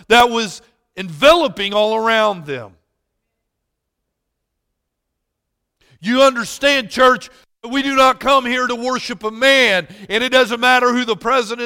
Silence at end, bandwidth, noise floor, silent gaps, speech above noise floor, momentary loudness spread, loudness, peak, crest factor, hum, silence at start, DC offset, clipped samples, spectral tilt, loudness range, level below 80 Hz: 0 s; 17 kHz; -76 dBFS; none; 61 dB; 12 LU; -15 LUFS; 0 dBFS; 16 dB; none; 0.1 s; under 0.1%; under 0.1%; -3 dB/octave; 7 LU; -50 dBFS